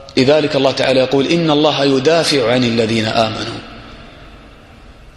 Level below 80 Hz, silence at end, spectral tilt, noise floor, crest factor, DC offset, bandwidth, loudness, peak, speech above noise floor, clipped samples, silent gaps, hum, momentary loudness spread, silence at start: -44 dBFS; 0.05 s; -5 dB/octave; -39 dBFS; 16 dB; under 0.1%; 12 kHz; -13 LUFS; 0 dBFS; 26 dB; under 0.1%; none; none; 12 LU; 0 s